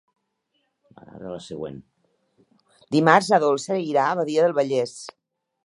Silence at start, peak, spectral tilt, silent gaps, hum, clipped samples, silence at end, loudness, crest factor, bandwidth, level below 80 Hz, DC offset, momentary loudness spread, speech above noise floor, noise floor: 1.15 s; 0 dBFS; -5 dB/octave; none; none; under 0.1%; 0.55 s; -21 LUFS; 24 dB; 11.5 kHz; -68 dBFS; under 0.1%; 20 LU; 52 dB; -73 dBFS